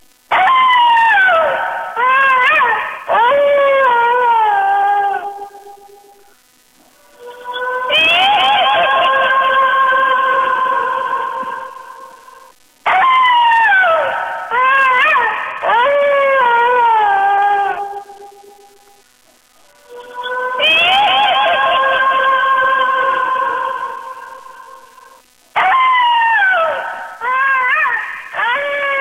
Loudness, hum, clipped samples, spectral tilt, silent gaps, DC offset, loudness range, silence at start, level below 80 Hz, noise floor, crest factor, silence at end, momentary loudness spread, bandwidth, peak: -12 LUFS; none; under 0.1%; -1.5 dB/octave; none; under 0.1%; 6 LU; 0.3 s; -60 dBFS; -51 dBFS; 10 dB; 0 s; 13 LU; 15.5 kHz; -4 dBFS